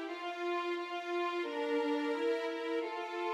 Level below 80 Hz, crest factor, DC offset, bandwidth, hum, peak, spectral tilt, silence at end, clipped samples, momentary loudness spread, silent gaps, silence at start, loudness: under -90 dBFS; 12 dB; under 0.1%; 12 kHz; none; -24 dBFS; -2 dB/octave; 0 s; under 0.1%; 5 LU; none; 0 s; -36 LUFS